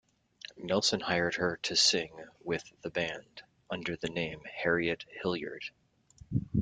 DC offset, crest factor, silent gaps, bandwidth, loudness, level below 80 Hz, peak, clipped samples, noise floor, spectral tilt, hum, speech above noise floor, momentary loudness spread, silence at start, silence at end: under 0.1%; 22 dB; none; 9.6 kHz; -32 LUFS; -62 dBFS; -12 dBFS; under 0.1%; -58 dBFS; -3.5 dB/octave; none; 26 dB; 18 LU; 0.5 s; 0 s